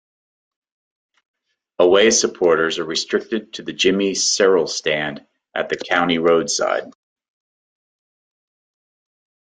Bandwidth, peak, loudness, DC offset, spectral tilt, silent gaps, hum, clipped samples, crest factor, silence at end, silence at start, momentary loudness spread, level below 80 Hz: 9.6 kHz; -2 dBFS; -18 LUFS; under 0.1%; -2.5 dB/octave; none; none; under 0.1%; 20 dB; 2.65 s; 1.8 s; 12 LU; -62 dBFS